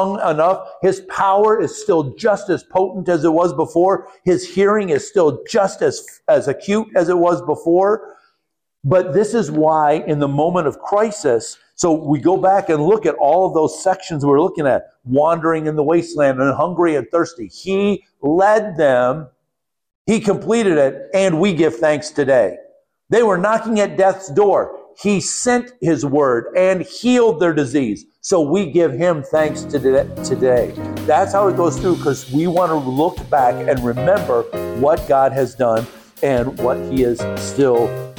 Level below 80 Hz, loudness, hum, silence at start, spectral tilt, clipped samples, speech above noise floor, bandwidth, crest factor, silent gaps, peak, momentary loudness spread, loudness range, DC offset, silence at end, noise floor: -46 dBFS; -17 LUFS; none; 0 s; -6 dB/octave; under 0.1%; 61 dB; 19 kHz; 12 dB; 19.95-20.05 s; -4 dBFS; 5 LU; 1 LU; under 0.1%; 0.05 s; -77 dBFS